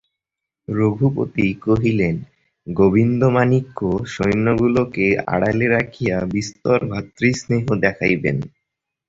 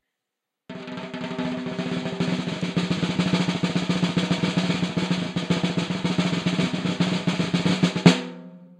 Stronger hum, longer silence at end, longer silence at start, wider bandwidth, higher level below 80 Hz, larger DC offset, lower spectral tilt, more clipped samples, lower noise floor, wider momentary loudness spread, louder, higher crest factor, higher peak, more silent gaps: neither; first, 0.6 s vs 0.05 s; about the same, 0.7 s vs 0.7 s; second, 7.8 kHz vs 10 kHz; first, -44 dBFS vs -58 dBFS; neither; first, -7.5 dB/octave vs -6 dB/octave; neither; about the same, -84 dBFS vs -84 dBFS; second, 7 LU vs 10 LU; first, -19 LUFS vs -24 LUFS; second, 16 dB vs 24 dB; about the same, -2 dBFS vs 0 dBFS; neither